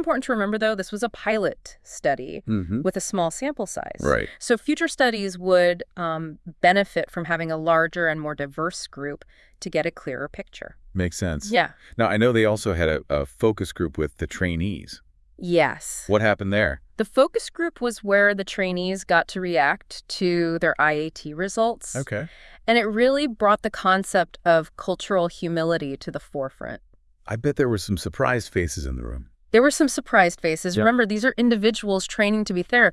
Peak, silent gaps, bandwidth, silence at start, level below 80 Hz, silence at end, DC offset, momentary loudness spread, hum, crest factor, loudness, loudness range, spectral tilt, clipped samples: -4 dBFS; none; 12 kHz; 0 s; -46 dBFS; 0 s; under 0.1%; 13 LU; none; 20 dB; -23 LUFS; 5 LU; -5 dB/octave; under 0.1%